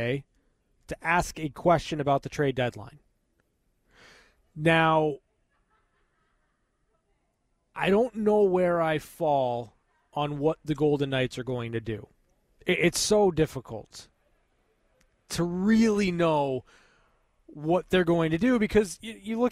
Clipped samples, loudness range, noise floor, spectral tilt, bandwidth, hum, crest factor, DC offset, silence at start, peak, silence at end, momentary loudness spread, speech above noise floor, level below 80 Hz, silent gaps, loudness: under 0.1%; 4 LU; -74 dBFS; -5.5 dB/octave; 15.5 kHz; none; 18 dB; under 0.1%; 0 s; -10 dBFS; 0 s; 14 LU; 48 dB; -52 dBFS; none; -26 LUFS